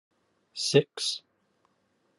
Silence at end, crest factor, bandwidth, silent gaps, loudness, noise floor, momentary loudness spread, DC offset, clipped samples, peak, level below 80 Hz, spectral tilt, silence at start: 1 s; 26 dB; 12 kHz; none; -27 LUFS; -72 dBFS; 14 LU; under 0.1%; under 0.1%; -6 dBFS; -76 dBFS; -4 dB/octave; 0.55 s